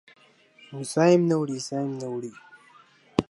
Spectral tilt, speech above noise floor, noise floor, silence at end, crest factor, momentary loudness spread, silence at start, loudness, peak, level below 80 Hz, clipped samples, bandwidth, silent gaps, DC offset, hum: -6 dB/octave; 32 dB; -56 dBFS; 0.1 s; 24 dB; 17 LU; 0.7 s; -25 LUFS; -4 dBFS; -60 dBFS; under 0.1%; 11.5 kHz; none; under 0.1%; none